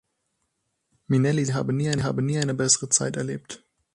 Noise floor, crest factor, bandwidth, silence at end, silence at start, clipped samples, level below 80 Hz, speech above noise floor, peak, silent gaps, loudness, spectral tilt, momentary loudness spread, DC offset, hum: -76 dBFS; 20 dB; 11 kHz; 0.4 s; 1.1 s; under 0.1%; -58 dBFS; 52 dB; -6 dBFS; none; -23 LUFS; -4.5 dB/octave; 13 LU; under 0.1%; none